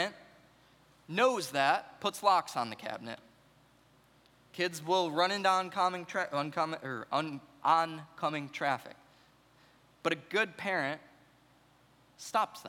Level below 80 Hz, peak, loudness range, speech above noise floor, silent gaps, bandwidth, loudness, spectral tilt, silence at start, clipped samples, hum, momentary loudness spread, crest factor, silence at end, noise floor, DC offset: -78 dBFS; -12 dBFS; 4 LU; 32 dB; none; 18.5 kHz; -32 LUFS; -3.5 dB/octave; 0 s; under 0.1%; none; 12 LU; 22 dB; 0 s; -65 dBFS; under 0.1%